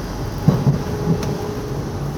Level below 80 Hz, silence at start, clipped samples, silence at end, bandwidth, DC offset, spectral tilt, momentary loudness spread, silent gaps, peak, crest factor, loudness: -34 dBFS; 0 s; under 0.1%; 0 s; 18 kHz; under 0.1%; -7.5 dB/octave; 9 LU; none; 0 dBFS; 20 dB; -21 LUFS